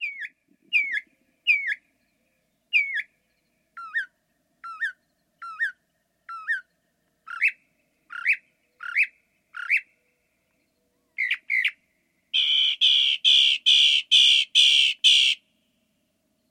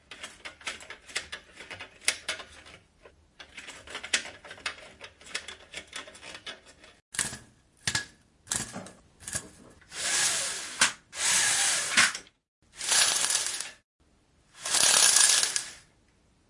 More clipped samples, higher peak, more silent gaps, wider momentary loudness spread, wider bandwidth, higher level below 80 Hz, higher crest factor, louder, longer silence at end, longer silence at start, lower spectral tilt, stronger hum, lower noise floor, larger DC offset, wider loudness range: neither; about the same, -6 dBFS vs -4 dBFS; second, none vs 7.02-7.12 s, 12.48-12.62 s, 13.84-13.99 s; about the same, 21 LU vs 23 LU; first, 16.5 kHz vs 11.5 kHz; second, -88 dBFS vs -64 dBFS; second, 20 dB vs 28 dB; first, -20 LUFS vs -25 LUFS; first, 1.15 s vs 0.7 s; about the same, 0 s vs 0.1 s; second, 6 dB/octave vs 1.5 dB/octave; neither; first, -72 dBFS vs -65 dBFS; neither; about the same, 16 LU vs 14 LU